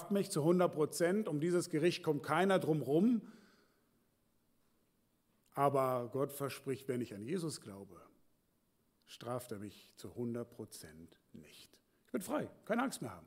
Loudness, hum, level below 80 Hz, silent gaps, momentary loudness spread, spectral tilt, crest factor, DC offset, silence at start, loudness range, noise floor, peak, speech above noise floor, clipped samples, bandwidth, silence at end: -36 LUFS; none; -82 dBFS; none; 20 LU; -6 dB/octave; 20 dB; under 0.1%; 0 s; 14 LU; -77 dBFS; -18 dBFS; 41 dB; under 0.1%; 16 kHz; 0 s